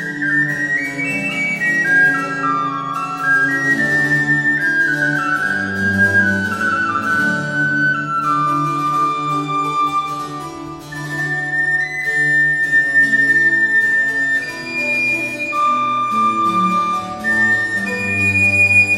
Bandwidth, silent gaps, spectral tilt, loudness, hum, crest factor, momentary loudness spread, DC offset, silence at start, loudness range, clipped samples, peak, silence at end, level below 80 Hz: 16 kHz; none; -4.5 dB/octave; -15 LUFS; none; 14 dB; 8 LU; under 0.1%; 0 s; 5 LU; under 0.1%; -4 dBFS; 0 s; -56 dBFS